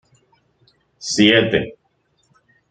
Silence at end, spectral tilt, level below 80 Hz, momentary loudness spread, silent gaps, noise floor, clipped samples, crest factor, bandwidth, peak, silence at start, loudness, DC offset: 1 s; -4 dB/octave; -54 dBFS; 19 LU; none; -65 dBFS; under 0.1%; 22 dB; 9.2 kHz; 0 dBFS; 1 s; -16 LUFS; under 0.1%